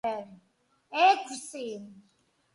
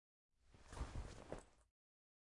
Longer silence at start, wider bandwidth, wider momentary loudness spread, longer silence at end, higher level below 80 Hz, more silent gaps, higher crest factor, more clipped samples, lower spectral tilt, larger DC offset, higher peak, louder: second, 0.05 s vs 0.45 s; about the same, 11.5 kHz vs 11.5 kHz; first, 19 LU vs 8 LU; about the same, 0.6 s vs 0.55 s; second, -80 dBFS vs -58 dBFS; neither; about the same, 22 dB vs 22 dB; neither; second, -2 dB/octave vs -5.5 dB/octave; neither; first, -10 dBFS vs -34 dBFS; first, -28 LUFS vs -55 LUFS